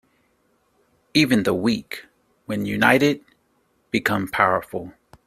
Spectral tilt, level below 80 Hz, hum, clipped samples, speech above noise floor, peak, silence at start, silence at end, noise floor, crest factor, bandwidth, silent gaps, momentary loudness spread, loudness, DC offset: -5 dB/octave; -58 dBFS; none; under 0.1%; 45 dB; 0 dBFS; 1.15 s; 0.35 s; -66 dBFS; 22 dB; 16 kHz; none; 16 LU; -21 LUFS; under 0.1%